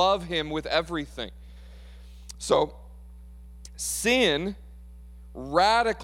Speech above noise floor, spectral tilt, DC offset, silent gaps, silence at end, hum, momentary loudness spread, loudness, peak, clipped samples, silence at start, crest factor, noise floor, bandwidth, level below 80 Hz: 19 dB; -3 dB/octave; under 0.1%; none; 0 s; none; 23 LU; -26 LUFS; -8 dBFS; under 0.1%; 0 s; 20 dB; -45 dBFS; 17 kHz; -46 dBFS